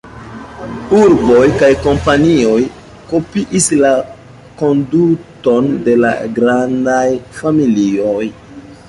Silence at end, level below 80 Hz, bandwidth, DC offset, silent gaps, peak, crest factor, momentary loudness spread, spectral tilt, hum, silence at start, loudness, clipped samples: 0.15 s; -38 dBFS; 11.5 kHz; under 0.1%; none; 0 dBFS; 12 dB; 12 LU; -5.5 dB/octave; none; 0.05 s; -12 LUFS; under 0.1%